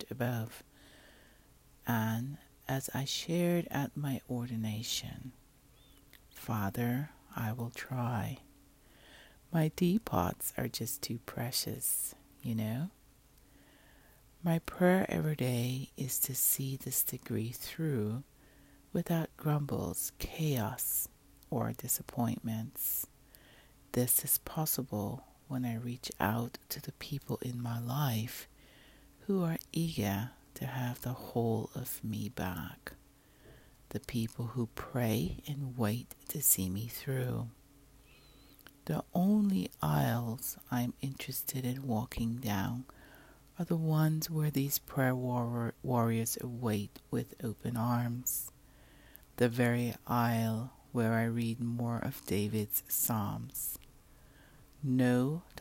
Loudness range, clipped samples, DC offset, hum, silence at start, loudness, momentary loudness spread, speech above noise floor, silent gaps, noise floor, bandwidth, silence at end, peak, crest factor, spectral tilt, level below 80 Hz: 5 LU; under 0.1%; under 0.1%; none; 0 s; -35 LUFS; 11 LU; 28 dB; none; -63 dBFS; 16.5 kHz; 0 s; -14 dBFS; 22 dB; -5 dB/octave; -60 dBFS